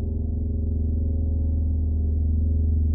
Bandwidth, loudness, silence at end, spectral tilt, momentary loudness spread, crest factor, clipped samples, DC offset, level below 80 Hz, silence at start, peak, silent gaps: 0.9 kHz; -25 LUFS; 0 s; -19 dB/octave; 4 LU; 8 dB; under 0.1%; under 0.1%; -24 dBFS; 0 s; -14 dBFS; none